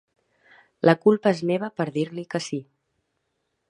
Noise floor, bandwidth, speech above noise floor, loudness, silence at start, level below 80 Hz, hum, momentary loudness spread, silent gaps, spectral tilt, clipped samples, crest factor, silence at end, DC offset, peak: -76 dBFS; 11 kHz; 54 dB; -23 LUFS; 0.85 s; -74 dBFS; none; 11 LU; none; -6.5 dB/octave; under 0.1%; 24 dB; 1.05 s; under 0.1%; -2 dBFS